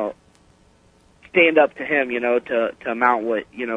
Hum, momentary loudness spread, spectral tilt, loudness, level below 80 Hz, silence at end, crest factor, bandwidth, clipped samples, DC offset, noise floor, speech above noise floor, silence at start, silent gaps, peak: none; 10 LU; -6 dB/octave; -19 LUFS; -62 dBFS; 0 s; 20 dB; 9.4 kHz; under 0.1%; under 0.1%; -55 dBFS; 36 dB; 0 s; none; -2 dBFS